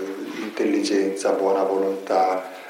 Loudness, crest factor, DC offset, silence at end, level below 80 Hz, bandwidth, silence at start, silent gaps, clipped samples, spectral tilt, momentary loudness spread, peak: -22 LUFS; 14 dB; under 0.1%; 0 s; -86 dBFS; 16.5 kHz; 0 s; none; under 0.1%; -4 dB/octave; 9 LU; -8 dBFS